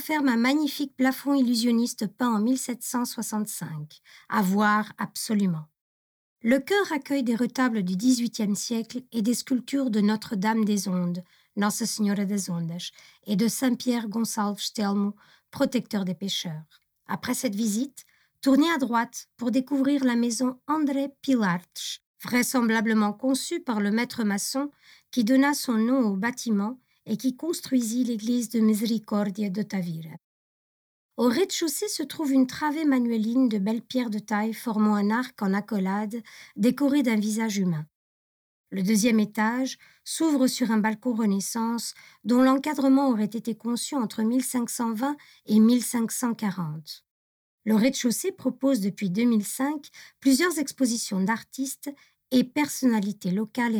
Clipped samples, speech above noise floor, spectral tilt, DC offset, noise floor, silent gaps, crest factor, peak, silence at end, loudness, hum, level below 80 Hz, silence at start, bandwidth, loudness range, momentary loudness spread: under 0.1%; over 65 dB; -4.5 dB/octave; under 0.1%; under -90 dBFS; 5.81-6.36 s, 22.06-22.15 s, 30.24-31.09 s, 37.95-38.64 s, 47.11-47.58 s; 14 dB; -10 dBFS; 0 s; -26 LUFS; none; -74 dBFS; 0 s; 20 kHz; 3 LU; 10 LU